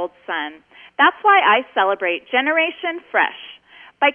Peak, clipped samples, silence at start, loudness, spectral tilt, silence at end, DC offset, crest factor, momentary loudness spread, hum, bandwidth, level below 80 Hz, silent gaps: -2 dBFS; under 0.1%; 0 s; -18 LUFS; -5 dB/octave; 0 s; under 0.1%; 18 dB; 16 LU; none; 3.8 kHz; -72 dBFS; none